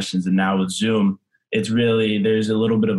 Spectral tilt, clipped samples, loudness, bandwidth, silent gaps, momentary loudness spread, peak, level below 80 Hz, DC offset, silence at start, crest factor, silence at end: -6 dB/octave; under 0.1%; -20 LUFS; 12 kHz; none; 5 LU; -8 dBFS; -62 dBFS; under 0.1%; 0 s; 12 dB; 0 s